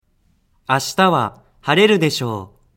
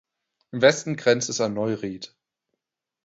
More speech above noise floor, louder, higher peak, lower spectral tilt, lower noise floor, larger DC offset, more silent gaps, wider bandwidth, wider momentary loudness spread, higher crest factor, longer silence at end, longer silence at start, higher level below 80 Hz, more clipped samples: second, 44 dB vs 59 dB; first, -17 LUFS vs -23 LUFS; first, 0 dBFS vs -4 dBFS; about the same, -4.5 dB/octave vs -4 dB/octave; second, -61 dBFS vs -82 dBFS; neither; neither; first, 16.5 kHz vs 8 kHz; about the same, 15 LU vs 17 LU; about the same, 18 dB vs 22 dB; second, 0.3 s vs 1 s; first, 0.7 s vs 0.55 s; first, -58 dBFS vs -66 dBFS; neither